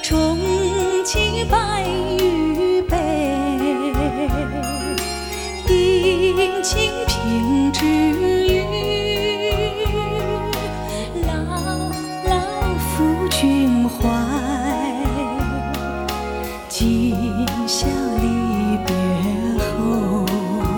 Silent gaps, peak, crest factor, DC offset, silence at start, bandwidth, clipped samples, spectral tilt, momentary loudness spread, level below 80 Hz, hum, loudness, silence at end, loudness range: none; -4 dBFS; 14 dB; under 0.1%; 0 s; 19.5 kHz; under 0.1%; -5 dB/octave; 7 LU; -30 dBFS; none; -20 LUFS; 0 s; 4 LU